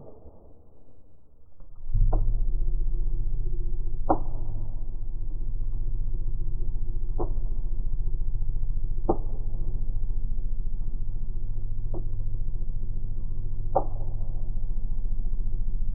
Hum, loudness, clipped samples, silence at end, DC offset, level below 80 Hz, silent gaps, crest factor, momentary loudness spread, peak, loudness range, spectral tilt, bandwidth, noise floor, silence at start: none; -34 LUFS; under 0.1%; 0 s; under 0.1%; -26 dBFS; none; 16 dB; 7 LU; -8 dBFS; 4 LU; -14.5 dB/octave; 1.5 kHz; -50 dBFS; 0 s